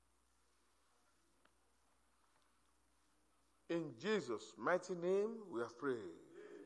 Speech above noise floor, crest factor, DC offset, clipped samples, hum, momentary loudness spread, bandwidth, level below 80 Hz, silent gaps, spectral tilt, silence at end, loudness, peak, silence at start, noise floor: 37 dB; 20 dB; under 0.1%; under 0.1%; none; 10 LU; 11 kHz; -88 dBFS; none; -5.5 dB/octave; 0 s; -42 LUFS; -26 dBFS; 3.7 s; -79 dBFS